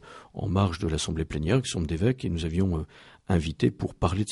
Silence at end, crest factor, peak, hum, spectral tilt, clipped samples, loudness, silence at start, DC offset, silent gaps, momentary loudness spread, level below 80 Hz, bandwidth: 0 s; 20 dB; -8 dBFS; none; -6 dB/octave; under 0.1%; -28 LUFS; 0.05 s; under 0.1%; none; 5 LU; -40 dBFS; 11.5 kHz